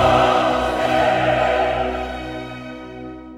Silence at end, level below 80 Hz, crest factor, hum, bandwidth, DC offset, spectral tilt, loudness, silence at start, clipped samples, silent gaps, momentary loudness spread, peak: 0 s; -38 dBFS; 16 dB; none; 14.5 kHz; under 0.1%; -5.5 dB/octave; -18 LUFS; 0 s; under 0.1%; none; 18 LU; -2 dBFS